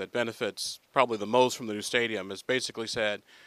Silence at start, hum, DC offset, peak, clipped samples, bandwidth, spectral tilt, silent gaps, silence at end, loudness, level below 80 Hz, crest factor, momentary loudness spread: 0 s; none; under 0.1%; -6 dBFS; under 0.1%; 15 kHz; -3 dB/octave; none; 0.3 s; -29 LUFS; -70 dBFS; 22 dB; 7 LU